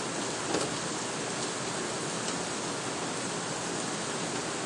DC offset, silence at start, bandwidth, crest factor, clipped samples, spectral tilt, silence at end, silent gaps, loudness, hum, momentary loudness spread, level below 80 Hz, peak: under 0.1%; 0 s; 11.5 kHz; 18 dB; under 0.1%; -2.5 dB/octave; 0 s; none; -32 LUFS; none; 2 LU; -66 dBFS; -14 dBFS